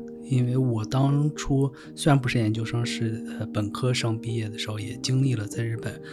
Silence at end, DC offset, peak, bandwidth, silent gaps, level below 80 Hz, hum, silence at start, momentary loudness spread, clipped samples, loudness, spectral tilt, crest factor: 0 s; under 0.1%; -6 dBFS; 12.5 kHz; none; -50 dBFS; none; 0 s; 8 LU; under 0.1%; -26 LUFS; -6 dB/octave; 18 dB